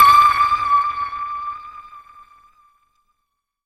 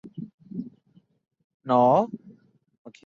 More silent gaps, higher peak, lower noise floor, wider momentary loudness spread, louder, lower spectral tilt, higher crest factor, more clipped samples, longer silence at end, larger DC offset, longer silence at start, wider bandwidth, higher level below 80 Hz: second, none vs 0.34-0.38 s, 1.44-1.60 s, 2.78-2.85 s; first, 0 dBFS vs -8 dBFS; first, -76 dBFS vs -62 dBFS; about the same, 23 LU vs 24 LU; first, -16 LUFS vs -22 LUFS; second, -1 dB/octave vs -8.5 dB/octave; about the same, 18 dB vs 20 dB; neither; first, 1.65 s vs 0.15 s; neither; about the same, 0 s vs 0.05 s; first, 15 kHz vs 7.2 kHz; first, -50 dBFS vs -72 dBFS